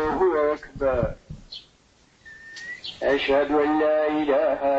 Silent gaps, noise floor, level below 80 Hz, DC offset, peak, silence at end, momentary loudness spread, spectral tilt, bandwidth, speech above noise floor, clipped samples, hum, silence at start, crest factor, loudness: none; -59 dBFS; -46 dBFS; under 0.1%; -10 dBFS; 0 s; 20 LU; -6.5 dB/octave; 8 kHz; 37 dB; under 0.1%; none; 0 s; 14 dB; -23 LUFS